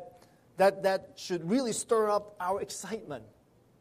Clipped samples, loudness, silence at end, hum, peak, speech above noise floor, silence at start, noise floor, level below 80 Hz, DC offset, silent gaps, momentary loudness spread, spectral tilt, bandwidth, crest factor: under 0.1%; -30 LUFS; 0.55 s; none; -12 dBFS; 27 dB; 0 s; -57 dBFS; -70 dBFS; under 0.1%; none; 14 LU; -4 dB/octave; 15.5 kHz; 18 dB